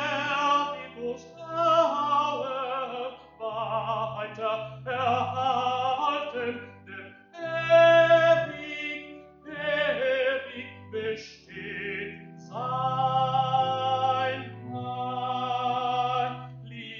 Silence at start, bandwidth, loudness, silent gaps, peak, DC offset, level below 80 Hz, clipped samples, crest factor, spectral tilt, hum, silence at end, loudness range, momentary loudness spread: 0 s; 7 kHz; -27 LUFS; none; -8 dBFS; under 0.1%; -66 dBFS; under 0.1%; 20 dB; -5 dB/octave; none; 0 s; 7 LU; 18 LU